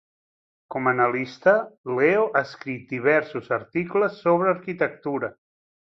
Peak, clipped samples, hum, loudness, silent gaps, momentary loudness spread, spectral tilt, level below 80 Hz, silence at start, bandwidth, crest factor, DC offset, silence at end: -6 dBFS; under 0.1%; none; -23 LUFS; 1.78-1.84 s; 10 LU; -7.5 dB/octave; -68 dBFS; 0.7 s; 6.4 kHz; 18 dB; under 0.1%; 0.65 s